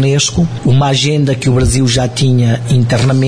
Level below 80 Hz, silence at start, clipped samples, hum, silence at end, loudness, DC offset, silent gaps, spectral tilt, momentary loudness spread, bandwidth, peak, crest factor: -28 dBFS; 0 s; under 0.1%; none; 0 s; -12 LUFS; 2%; none; -5.5 dB/octave; 2 LU; 10.5 kHz; -2 dBFS; 8 dB